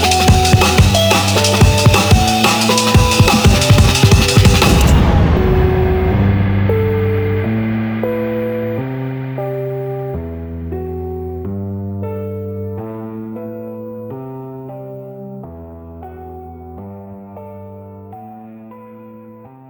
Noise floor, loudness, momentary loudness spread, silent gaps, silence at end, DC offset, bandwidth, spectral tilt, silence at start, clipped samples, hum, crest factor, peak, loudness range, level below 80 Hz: -38 dBFS; -13 LUFS; 23 LU; none; 0.2 s; under 0.1%; over 20 kHz; -5 dB/octave; 0 s; under 0.1%; none; 14 dB; 0 dBFS; 22 LU; -24 dBFS